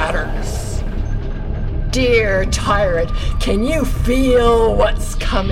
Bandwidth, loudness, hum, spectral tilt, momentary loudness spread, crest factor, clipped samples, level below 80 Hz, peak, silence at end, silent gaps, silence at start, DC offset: 14.5 kHz; -17 LUFS; none; -5.5 dB/octave; 11 LU; 14 dB; under 0.1%; -20 dBFS; -2 dBFS; 0 s; none; 0 s; under 0.1%